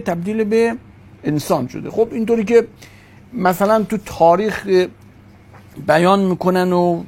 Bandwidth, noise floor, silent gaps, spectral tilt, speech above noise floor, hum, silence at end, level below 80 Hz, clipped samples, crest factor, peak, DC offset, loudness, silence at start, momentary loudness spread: 16.5 kHz; -44 dBFS; none; -6.5 dB/octave; 27 dB; none; 0 s; -50 dBFS; under 0.1%; 16 dB; 0 dBFS; under 0.1%; -17 LUFS; 0 s; 10 LU